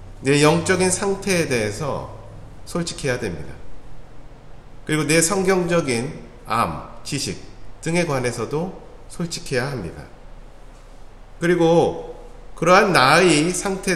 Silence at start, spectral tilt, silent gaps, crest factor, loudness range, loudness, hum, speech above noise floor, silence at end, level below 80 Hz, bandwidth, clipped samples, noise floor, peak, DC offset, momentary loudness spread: 0 s; -4.5 dB/octave; none; 20 dB; 10 LU; -20 LUFS; none; 21 dB; 0 s; -42 dBFS; 14.5 kHz; under 0.1%; -41 dBFS; 0 dBFS; under 0.1%; 20 LU